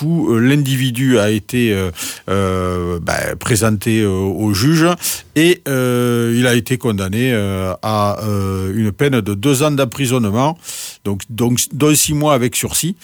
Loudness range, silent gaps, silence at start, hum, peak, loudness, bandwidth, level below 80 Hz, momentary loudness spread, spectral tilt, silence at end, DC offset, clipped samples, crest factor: 2 LU; none; 0 s; none; -2 dBFS; -16 LUFS; over 20 kHz; -44 dBFS; 6 LU; -5 dB/octave; 0.1 s; under 0.1%; under 0.1%; 14 dB